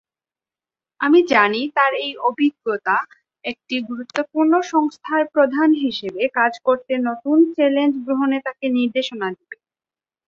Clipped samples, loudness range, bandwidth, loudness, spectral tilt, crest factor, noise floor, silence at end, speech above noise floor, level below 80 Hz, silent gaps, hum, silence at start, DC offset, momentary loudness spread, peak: under 0.1%; 2 LU; 7.4 kHz; -19 LUFS; -4.5 dB/octave; 18 dB; under -90 dBFS; 0.75 s; over 71 dB; -68 dBFS; none; none; 1 s; under 0.1%; 10 LU; -2 dBFS